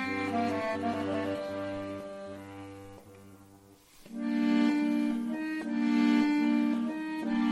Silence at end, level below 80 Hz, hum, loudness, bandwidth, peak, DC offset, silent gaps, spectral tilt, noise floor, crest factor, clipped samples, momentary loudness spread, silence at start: 0 s; -68 dBFS; none; -30 LUFS; 12.5 kHz; -16 dBFS; under 0.1%; none; -6 dB/octave; -57 dBFS; 14 dB; under 0.1%; 18 LU; 0 s